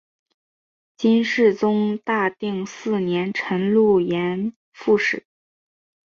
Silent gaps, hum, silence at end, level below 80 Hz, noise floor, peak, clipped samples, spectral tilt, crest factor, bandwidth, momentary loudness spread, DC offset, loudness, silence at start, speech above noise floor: 4.56-4.72 s; none; 0.95 s; -64 dBFS; under -90 dBFS; -6 dBFS; under 0.1%; -6.5 dB/octave; 16 dB; 7.2 kHz; 10 LU; under 0.1%; -21 LUFS; 1 s; over 70 dB